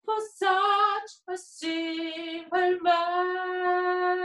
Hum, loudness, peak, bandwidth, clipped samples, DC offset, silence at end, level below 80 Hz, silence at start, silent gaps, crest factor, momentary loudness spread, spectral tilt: none; -27 LUFS; -10 dBFS; 11.5 kHz; under 0.1%; under 0.1%; 0 s; -78 dBFS; 0.05 s; none; 16 dB; 11 LU; -2 dB/octave